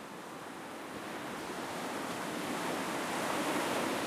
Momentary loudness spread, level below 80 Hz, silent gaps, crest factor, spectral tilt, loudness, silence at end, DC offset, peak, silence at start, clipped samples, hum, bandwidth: 11 LU; -74 dBFS; none; 16 dB; -3.5 dB/octave; -37 LUFS; 0 s; under 0.1%; -22 dBFS; 0 s; under 0.1%; none; 15.5 kHz